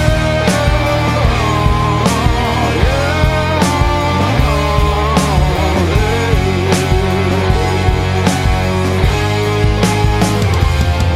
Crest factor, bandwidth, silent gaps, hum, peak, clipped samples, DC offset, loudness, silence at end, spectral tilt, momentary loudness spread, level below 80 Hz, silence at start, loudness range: 12 dB; 15.5 kHz; none; none; 0 dBFS; under 0.1%; under 0.1%; -13 LUFS; 0 s; -5.5 dB/octave; 1 LU; -18 dBFS; 0 s; 1 LU